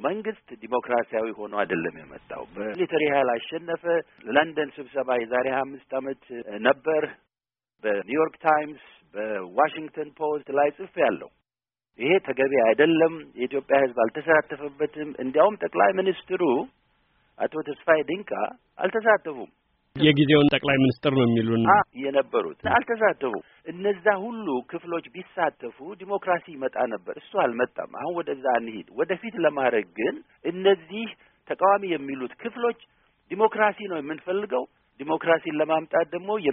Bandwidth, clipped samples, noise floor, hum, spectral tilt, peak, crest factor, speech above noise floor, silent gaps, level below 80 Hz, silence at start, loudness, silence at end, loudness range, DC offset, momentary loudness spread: 4 kHz; under 0.1%; under -90 dBFS; none; -4 dB/octave; -4 dBFS; 22 dB; over 65 dB; none; -64 dBFS; 0 s; -25 LUFS; 0 s; 6 LU; under 0.1%; 13 LU